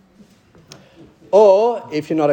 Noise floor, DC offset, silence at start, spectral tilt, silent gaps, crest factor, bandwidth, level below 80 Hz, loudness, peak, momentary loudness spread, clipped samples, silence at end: -50 dBFS; under 0.1%; 1.3 s; -6.5 dB/octave; none; 16 dB; 8.6 kHz; -64 dBFS; -15 LUFS; -2 dBFS; 11 LU; under 0.1%; 0 s